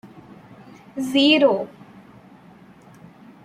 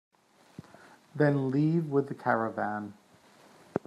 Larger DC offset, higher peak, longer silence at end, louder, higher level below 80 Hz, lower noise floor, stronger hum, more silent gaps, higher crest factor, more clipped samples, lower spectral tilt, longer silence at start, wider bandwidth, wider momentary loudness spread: neither; first, -4 dBFS vs -12 dBFS; first, 1.8 s vs 0.1 s; first, -18 LUFS vs -29 LUFS; first, -68 dBFS vs -76 dBFS; second, -48 dBFS vs -59 dBFS; neither; neither; about the same, 20 dB vs 20 dB; neither; second, -4.5 dB/octave vs -9 dB/octave; second, 0.05 s vs 0.6 s; first, 15.5 kHz vs 10.5 kHz; about the same, 21 LU vs 19 LU